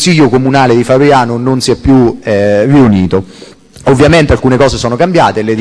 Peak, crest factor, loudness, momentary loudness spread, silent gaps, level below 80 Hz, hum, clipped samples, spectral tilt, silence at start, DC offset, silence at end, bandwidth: 0 dBFS; 8 dB; -8 LUFS; 5 LU; none; -28 dBFS; none; 0.7%; -6 dB/octave; 0 s; under 0.1%; 0 s; 11 kHz